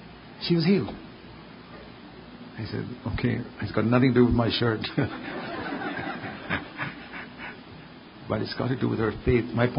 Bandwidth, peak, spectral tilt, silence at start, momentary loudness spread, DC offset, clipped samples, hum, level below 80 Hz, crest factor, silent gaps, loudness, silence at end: 5.4 kHz; -6 dBFS; -11 dB/octave; 0 s; 23 LU; under 0.1%; under 0.1%; none; -46 dBFS; 20 dB; none; -27 LUFS; 0 s